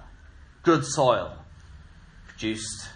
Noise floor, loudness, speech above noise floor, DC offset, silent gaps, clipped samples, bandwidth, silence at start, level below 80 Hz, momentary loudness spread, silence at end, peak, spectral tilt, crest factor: -49 dBFS; -25 LUFS; 25 dB; under 0.1%; none; under 0.1%; 10.5 kHz; 0 s; -50 dBFS; 14 LU; 0 s; -6 dBFS; -4.5 dB/octave; 22 dB